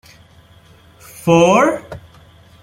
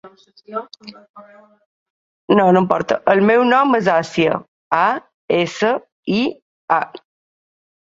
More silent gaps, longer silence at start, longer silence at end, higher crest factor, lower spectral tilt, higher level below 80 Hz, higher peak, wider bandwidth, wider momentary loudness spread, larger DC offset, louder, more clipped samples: second, none vs 1.09-1.14 s, 1.66-2.28 s, 4.48-4.71 s, 5.14-5.28 s, 5.92-6.03 s, 6.42-6.68 s; first, 1.25 s vs 0.05 s; second, 0.65 s vs 0.85 s; about the same, 16 dB vs 18 dB; about the same, -5.5 dB/octave vs -6 dB/octave; first, -50 dBFS vs -60 dBFS; about the same, -2 dBFS vs 0 dBFS; first, 16.5 kHz vs 7.8 kHz; first, 25 LU vs 16 LU; neither; first, -14 LUFS vs -17 LUFS; neither